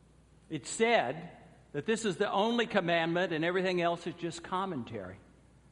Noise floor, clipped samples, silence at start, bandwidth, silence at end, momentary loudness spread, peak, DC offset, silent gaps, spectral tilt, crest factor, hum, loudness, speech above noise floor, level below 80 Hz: -61 dBFS; under 0.1%; 0.5 s; 11.5 kHz; 0.55 s; 14 LU; -12 dBFS; under 0.1%; none; -4.5 dB/octave; 22 dB; none; -32 LUFS; 29 dB; -66 dBFS